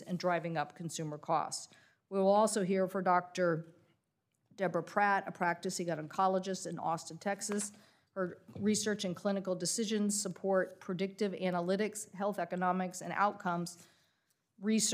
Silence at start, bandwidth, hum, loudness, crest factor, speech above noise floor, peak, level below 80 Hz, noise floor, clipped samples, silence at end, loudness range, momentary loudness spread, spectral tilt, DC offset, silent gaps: 0 s; 15.5 kHz; none; -35 LUFS; 18 dB; 47 dB; -16 dBFS; -88 dBFS; -82 dBFS; under 0.1%; 0 s; 3 LU; 9 LU; -4 dB/octave; under 0.1%; none